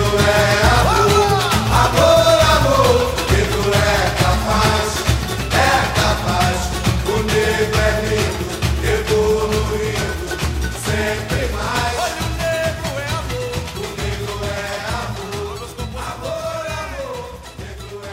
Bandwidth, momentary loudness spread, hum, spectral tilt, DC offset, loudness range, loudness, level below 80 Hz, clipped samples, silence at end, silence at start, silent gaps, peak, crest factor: 16 kHz; 13 LU; none; -4.5 dB/octave; under 0.1%; 11 LU; -17 LUFS; -26 dBFS; under 0.1%; 0 s; 0 s; none; 0 dBFS; 16 dB